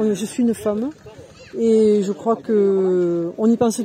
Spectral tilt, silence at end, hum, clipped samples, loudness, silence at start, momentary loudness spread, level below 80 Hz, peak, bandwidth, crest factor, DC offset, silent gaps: -6.5 dB/octave; 0 s; none; under 0.1%; -19 LUFS; 0 s; 7 LU; -58 dBFS; -6 dBFS; 15 kHz; 12 dB; under 0.1%; none